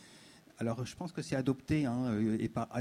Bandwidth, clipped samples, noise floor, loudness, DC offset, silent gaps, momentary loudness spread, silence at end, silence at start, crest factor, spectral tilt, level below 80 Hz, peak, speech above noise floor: 15 kHz; under 0.1%; -58 dBFS; -35 LUFS; under 0.1%; none; 8 LU; 0 s; 0 s; 16 dB; -7 dB/octave; -60 dBFS; -18 dBFS; 24 dB